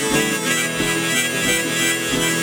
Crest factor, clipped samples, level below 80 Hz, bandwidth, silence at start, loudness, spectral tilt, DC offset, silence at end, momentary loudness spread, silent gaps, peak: 16 dB; under 0.1%; -46 dBFS; over 20 kHz; 0 s; -18 LUFS; -2 dB/octave; under 0.1%; 0 s; 1 LU; none; -4 dBFS